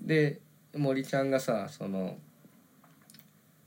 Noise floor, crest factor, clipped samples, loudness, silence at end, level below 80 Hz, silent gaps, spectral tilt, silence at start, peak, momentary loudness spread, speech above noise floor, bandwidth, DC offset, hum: -61 dBFS; 18 dB; under 0.1%; -31 LUFS; 1.45 s; -90 dBFS; none; -6.5 dB/octave; 0 s; -14 dBFS; 15 LU; 30 dB; 17 kHz; under 0.1%; none